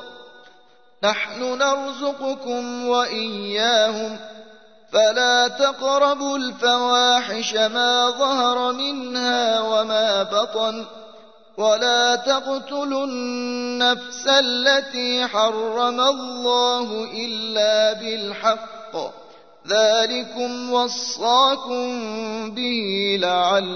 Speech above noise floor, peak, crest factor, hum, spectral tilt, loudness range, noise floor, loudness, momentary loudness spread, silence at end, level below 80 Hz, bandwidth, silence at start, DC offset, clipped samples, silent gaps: 34 dB; -4 dBFS; 18 dB; none; -2 dB/octave; 4 LU; -55 dBFS; -20 LUFS; 10 LU; 0 s; -72 dBFS; 6.6 kHz; 0 s; 0.2%; under 0.1%; none